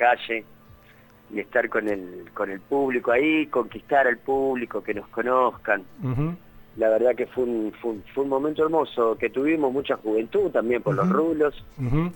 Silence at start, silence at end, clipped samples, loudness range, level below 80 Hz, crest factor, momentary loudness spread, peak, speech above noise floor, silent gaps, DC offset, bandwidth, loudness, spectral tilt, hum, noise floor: 0 s; 0 s; under 0.1%; 2 LU; -48 dBFS; 18 dB; 10 LU; -6 dBFS; 29 dB; none; under 0.1%; 18.5 kHz; -24 LUFS; -8 dB/octave; none; -52 dBFS